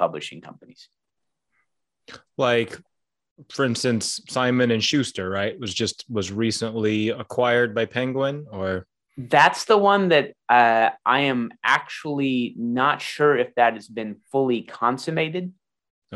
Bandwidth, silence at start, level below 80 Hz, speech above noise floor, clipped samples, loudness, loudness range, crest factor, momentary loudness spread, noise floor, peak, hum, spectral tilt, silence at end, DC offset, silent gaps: 12.5 kHz; 0 s; -66 dBFS; 61 dB; under 0.1%; -22 LUFS; 7 LU; 20 dB; 13 LU; -83 dBFS; -2 dBFS; none; -4.5 dB/octave; 0 s; under 0.1%; 3.31-3.36 s, 15.90-16.02 s